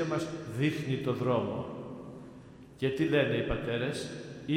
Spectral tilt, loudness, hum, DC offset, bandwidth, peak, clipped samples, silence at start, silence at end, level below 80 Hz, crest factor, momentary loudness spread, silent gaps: -6.5 dB/octave; -32 LUFS; none; under 0.1%; 15.5 kHz; -14 dBFS; under 0.1%; 0 s; 0 s; -54 dBFS; 18 dB; 19 LU; none